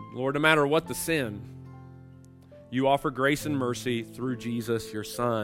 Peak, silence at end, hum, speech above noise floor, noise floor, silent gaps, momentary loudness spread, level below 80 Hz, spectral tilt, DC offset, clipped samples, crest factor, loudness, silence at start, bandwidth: -6 dBFS; 0 s; none; 23 dB; -50 dBFS; none; 17 LU; -58 dBFS; -5 dB/octave; under 0.1%; under 0.1%; 24 dB; -27 LUFS; 0 s; 16 kHz